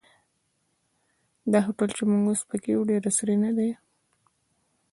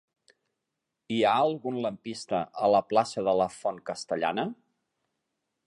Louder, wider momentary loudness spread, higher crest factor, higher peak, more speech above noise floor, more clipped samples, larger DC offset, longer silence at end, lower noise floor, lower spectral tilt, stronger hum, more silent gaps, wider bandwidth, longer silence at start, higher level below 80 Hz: first, -25 LUFS vs -28 LUFS; second, 6 LU vs 10 LU; about the same, 20 dB vs 20 dB; about the same, -8 dBFS vs -10 dBFS; second, 49 dB vs 57 dB; neither; neither; about the same, 1.2 s vs 1.15 s; second, -73 dBFS vs -84 dBFS; about the same, -5.5 dB/octave vs -5 dB/octave; neither; neither; about the same, 11.5 kHz vs 11.5 kHz; first, 1.45 s vs 1.1 s; about the same, -70 dBFS vs -70 dBFS